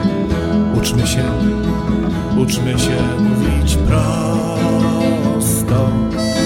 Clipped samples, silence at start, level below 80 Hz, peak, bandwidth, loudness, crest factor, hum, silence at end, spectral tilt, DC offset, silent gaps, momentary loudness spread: under 0.1%; 0 s; -24 dBFS; -4 dBFS; 16.5 kHz; -16 LUFS; 12 dB; none; 0 s; -6 dB/octave; under 0.1%; none; 3 LU